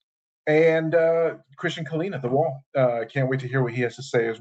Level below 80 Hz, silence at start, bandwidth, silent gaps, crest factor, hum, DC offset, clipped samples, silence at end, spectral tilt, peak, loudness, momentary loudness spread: -70 dBFS; 0.45 s; 8.2 kHz; 2.66-2.72 s; 16 dB; none; under 0.1%; under 0.1%; 0 s; -7 dB/octave; -6 dBFS; -24 LUFS; 9 LU